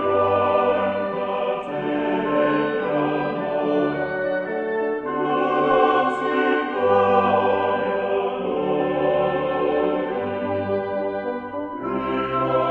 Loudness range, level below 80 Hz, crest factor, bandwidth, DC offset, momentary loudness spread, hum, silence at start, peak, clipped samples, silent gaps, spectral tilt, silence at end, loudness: 4 LU; -54 dBFS; 16 dB; 5.8 kHz; under 0.1%; 7 LU; none; 0 s; -6 dBFS; under 0.1%; none; -8 dB/octave; 0 s; -22 LUFS